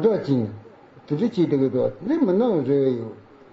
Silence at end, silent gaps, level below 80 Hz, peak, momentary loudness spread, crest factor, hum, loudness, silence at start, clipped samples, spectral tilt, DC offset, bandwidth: 0.35 s; none; -58 dBFS; -8 dBFS; 11 LU; 14 dB; none; -22 LUFS; 0 s; under 0.1%; -8.5 dB/octave; under 0.1%; 7.2 kHz